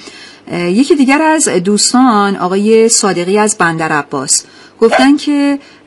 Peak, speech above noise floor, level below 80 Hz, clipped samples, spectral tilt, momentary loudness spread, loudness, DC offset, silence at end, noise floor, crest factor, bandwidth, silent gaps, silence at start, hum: 0 dBFS; 23 dB; -54 dBFS; 0.1%; -3.5 dB/octave; 7 LU; -10 LUFS; under 0.1%; 0.25 s; -33 dBFS; 10 dB; 12 kHz; none; 0 s; none